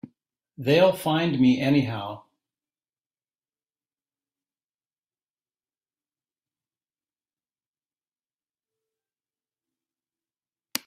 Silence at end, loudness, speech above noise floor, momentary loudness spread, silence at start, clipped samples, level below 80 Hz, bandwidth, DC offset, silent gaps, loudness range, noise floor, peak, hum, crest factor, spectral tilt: 0.1 s; -22 LUFS; over 69 dB; 15 LU; 0.6 s; under 0.1%; -68 dBFS; 15.5 kHz; under 0.1%; 4.86-4.90 s, 4.98-5.02 s, 5.30-5.34 s, 7.66-7.74 s; 18 LU; under -90 dBFS; -4 dBFS; none; 26 dB; -6 dB/octave